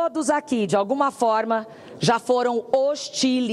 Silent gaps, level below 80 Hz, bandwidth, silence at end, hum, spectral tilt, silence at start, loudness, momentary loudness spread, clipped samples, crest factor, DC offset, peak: none; -72 dBFS; 13 kHz; 0 s; none; -4.5 dB/octave; 0 s; -22 LUFS; 4 LU; under 0.1%; 16 dB; under 0.1%; -6 dBFS